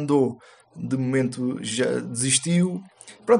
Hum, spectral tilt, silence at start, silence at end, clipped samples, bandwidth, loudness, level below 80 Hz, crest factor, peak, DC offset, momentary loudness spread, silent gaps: none; -4.5 dB/octave; 0 s; 0 s; under 0.1%; 11.5 kHz; -24 LUFS; -68 dBFS; 18 dB; -6 dBFS; under 0.1%; 15 LU; none